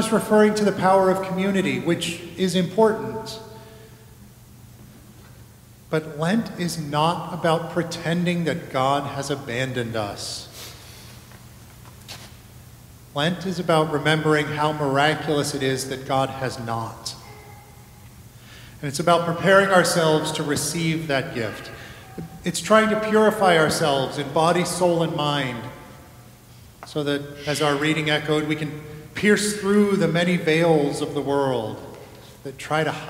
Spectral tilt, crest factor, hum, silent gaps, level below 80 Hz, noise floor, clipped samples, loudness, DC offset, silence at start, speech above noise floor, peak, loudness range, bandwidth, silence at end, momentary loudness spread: -5 dB/octave; 20 dB; none; none; -54 dBFS; -47 dBFS; under 0.1%; -22 LUFS; under 0.1%; 0 s; 25 dB; -2 dBFS; 9 LU; 16 kHz; 0 s; 20 LU